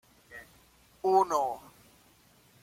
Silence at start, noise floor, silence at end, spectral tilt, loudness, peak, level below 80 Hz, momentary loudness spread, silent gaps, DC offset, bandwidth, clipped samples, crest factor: 0.3 s; -62 dBFS; 1.05 s; -4.5 dB/octave; -28 LUFS; -12 dBFS; -70 dBFS; 24 LU; none; under 0.1%; 16 kHz; under 0.1%; 20 dB